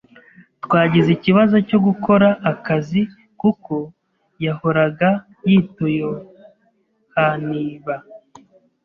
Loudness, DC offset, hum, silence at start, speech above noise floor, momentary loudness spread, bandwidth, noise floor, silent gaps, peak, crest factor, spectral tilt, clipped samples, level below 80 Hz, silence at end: -18 LUFS; under 0.1%; none; 0.65 s; 46 dB; 13 LU; 6 kHz; -63 dBFS; none; -2 dBFS; 16 dB; -9 dB/octave; under 0.1%; -56 dBFS; 0.7 s